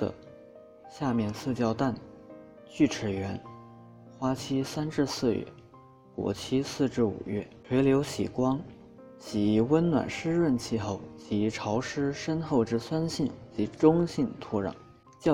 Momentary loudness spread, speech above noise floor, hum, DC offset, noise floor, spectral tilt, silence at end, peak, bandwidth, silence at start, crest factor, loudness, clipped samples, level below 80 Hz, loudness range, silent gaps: 18 LU; 26 dB; none; under 0.1%; -54 dBFS; -6.5 dB/octave; 0 s; -8 dBFS; 15.5 kHz; 0 s; 22 dB; -29 LUFS; under 0.1%; -58 dBFS; 4 LU; none